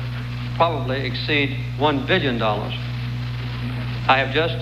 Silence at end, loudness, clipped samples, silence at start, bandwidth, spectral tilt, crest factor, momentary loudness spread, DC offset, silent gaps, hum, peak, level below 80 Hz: 0 s; -22 LUFS; under 0.1%; 0 s; 7.2 kHz; -7 dB/octave; 18 dB; 9 LU; under 0.1%; none; none; -4 dBFS; -38 dBFS